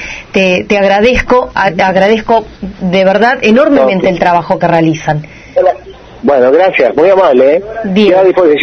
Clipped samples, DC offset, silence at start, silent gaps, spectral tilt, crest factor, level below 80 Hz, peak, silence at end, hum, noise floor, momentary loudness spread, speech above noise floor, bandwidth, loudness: 0.5%; under 0.1%; 0 s; none; -6 dB/octave; 8 dB; -34 dBFS; 0 dBFS; 0 s; none; -30 dBFS; 8 LU; 22 dB; 6.6 kHz; -9 LUFS